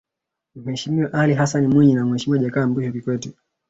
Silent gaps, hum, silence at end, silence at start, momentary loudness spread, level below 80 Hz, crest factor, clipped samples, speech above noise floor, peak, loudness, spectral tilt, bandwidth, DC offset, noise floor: none; none; 0.4 s; 0.55 s; 13 LU; -56 dBFS; 16 dB; under 0.1%; 64 dB; -4 dBFS; -19 LUFS; -6.5 dB/octave; 8 kHz; under 0.1%; -83 dBFS